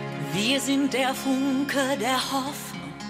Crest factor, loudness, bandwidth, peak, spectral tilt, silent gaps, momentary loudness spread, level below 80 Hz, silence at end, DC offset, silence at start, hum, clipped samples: 14 dB; -25 LUFS; 16 kHz; -12 dBFS; -3.5 dB/octave; none; 8 LU; -60 dBFS; 0 s; under 0.1%; 0 s; none; under 0.1%